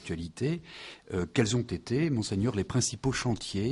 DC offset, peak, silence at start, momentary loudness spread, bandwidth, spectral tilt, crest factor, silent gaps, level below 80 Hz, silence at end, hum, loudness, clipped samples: under 0.1%; -10 dBFS; 0 s; 9 LU; 11.5 kHz; -5 dB/octave; 20 dB; none; -52 dBFS; 0 s; none; -31 LUFS; under 0.1%